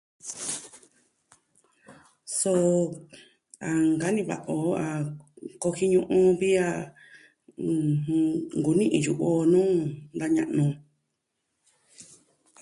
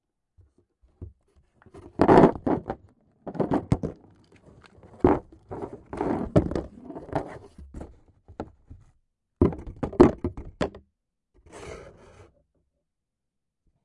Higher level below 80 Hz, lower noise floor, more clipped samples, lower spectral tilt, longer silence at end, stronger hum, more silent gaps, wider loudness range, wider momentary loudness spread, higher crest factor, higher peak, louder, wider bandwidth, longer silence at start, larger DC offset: second, -64 dBFS vs -44 dBFS; second, -79 dBFS vs -84 dBFS; neither; second, -6 dB/octave vs -8.5 dB/octave; second, 0.6 s vs 2 s; neither; neither; second, 4 LU vs 8 LU; second, 15 LU vs 25 LU; second, 16 dB vs 26 dB; second, -10 dBFS vs -2 dBFS; about the same, -26 LUFS vs -24 LUFS; about the same, 11.5 kHz vs 11 kHz; second, 0.25 s vs 1 s; neither